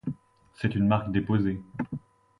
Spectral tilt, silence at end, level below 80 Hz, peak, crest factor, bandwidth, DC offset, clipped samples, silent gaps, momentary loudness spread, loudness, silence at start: -9 dB/octave; 0.4 s; -50 dBFS; -8 dBFS; 20 dB; 5.4 kHz; under 0.1%; under 0.1%; none; 14 LU; -28 LUFS; 0.05 s